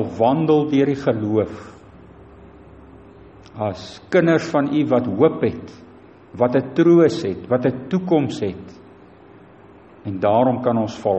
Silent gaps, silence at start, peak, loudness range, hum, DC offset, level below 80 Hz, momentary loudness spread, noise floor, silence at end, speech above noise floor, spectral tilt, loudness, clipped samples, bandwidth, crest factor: none; 0 s; -2 dBFS; 6 LU; none; under 0.1%; -54 dBFS; 16 LU; -45 dBFS; 0 s; 27 dB; -7.5 dB/octave; -19 LUFS; under 0.1%; 8.4 kHz; 18 dB